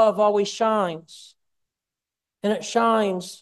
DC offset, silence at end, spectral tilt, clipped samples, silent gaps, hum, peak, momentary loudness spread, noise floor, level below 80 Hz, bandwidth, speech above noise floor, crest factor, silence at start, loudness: under 0.1%; 0.05 s; -4.5 dB/octave; under 0.1%; none; none; -6 dBFS; 9 LU; -88 dBFS; -74 dBFS; 12.5 kHz; 66 dB; 16 dB; 0 s; -22 LUFS